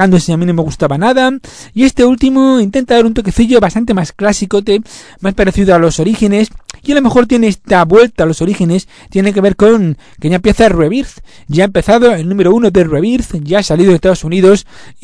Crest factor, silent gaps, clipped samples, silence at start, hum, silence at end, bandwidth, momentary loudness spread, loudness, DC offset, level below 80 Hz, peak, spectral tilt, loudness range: 10 dB; none; 1%; 0 s; none; 0.1 s; 11 kHz; 7 LU; -10 LUFS; under 0.1%; -30 dBFS; 0 dBFS; -6 dB/octave; 2 LU